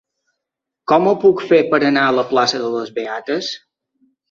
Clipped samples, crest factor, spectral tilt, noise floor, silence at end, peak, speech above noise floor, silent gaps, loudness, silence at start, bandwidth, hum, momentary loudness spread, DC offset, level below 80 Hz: under 0.1%; 16 dB; -4.5 dB/octave; -82 dBFS; 0.75 s; -2 dBFS; 66 dB; none; -16 LUFS; 0.9 s; 7.4 kHz; none; 11 LU; under 0.1%; -64 dBFS